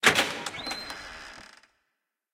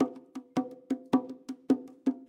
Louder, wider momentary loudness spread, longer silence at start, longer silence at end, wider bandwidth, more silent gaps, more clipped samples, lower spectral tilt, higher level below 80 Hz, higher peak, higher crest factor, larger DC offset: first, -29 LUFS vs -33 LUFS; first, 22 LU vs 13 LU; about the same, 0 s vs 0 s; first, 0.9 s vs 0.05 s; first, 16.5 kHz vs 9.8 kHz; neither; neither; second, -1.5 dB/octave vs -7 dB/octave; first, -62 dBFS vs -78 dBFS; first, -4 dBFS vs -12 dBFS; first, 26 dB vs 20 dB; neither